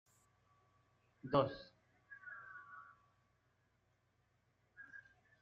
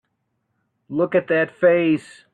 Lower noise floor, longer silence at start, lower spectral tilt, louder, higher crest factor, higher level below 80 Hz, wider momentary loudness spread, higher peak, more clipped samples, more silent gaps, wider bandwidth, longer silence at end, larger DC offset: first, -79 dBFS vs -73 dBFS; first, 1.25 s vs 0.9 s; second, -5 dB/octave vs -7.5 dB/octave; second, -40 LUFS vs -20 LUFS; first, 28 dB vs 16 dB; second, -78 dBFS vs -66 dBFS; first, 24 LU vs 8 LU; second, -20 dBFS vs -6 dBFS; neither; neither; second, 7.4 kHz vs 9.4 kHz; about the same, 0.4 s vs 0.35 s; neither